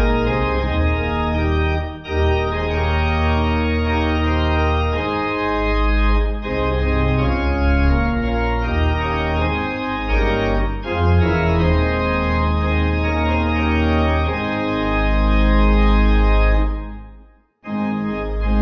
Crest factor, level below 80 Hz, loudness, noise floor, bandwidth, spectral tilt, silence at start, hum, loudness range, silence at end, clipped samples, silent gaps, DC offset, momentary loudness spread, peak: 14 dB; -20 dBFS; -19 LUFS; -47 dBFS; 6.6 kHz; -8.5 dB/octave; 0 s; none; 2 LU; 0 s; under 0.1%; none; under 0.1%; 6 LU; -4 dBFS